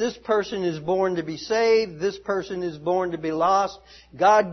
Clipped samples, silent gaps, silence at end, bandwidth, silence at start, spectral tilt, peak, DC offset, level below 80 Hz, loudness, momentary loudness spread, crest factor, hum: under 0.1%; none; 0 s; 6.4 kHz; 0 s; -5 dB/octave; -6 dBFS; under 0.1%; -58 dBFS; -24 LUFS; 9 LU; 16 dB; none